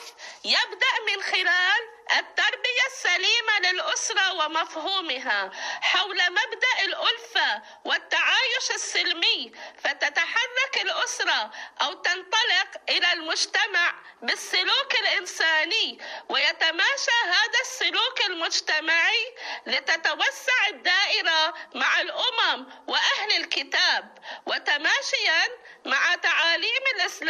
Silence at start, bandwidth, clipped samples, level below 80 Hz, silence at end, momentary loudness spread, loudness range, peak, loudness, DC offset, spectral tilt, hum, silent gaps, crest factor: 0 s; 13 kHz; under 0.1%; -84 dBFS; 0 s; 7 LU; 2 LU; -8 dBFS; -23 LUFS; under 0.1%; 2 dB/octave; none; none; 16 dB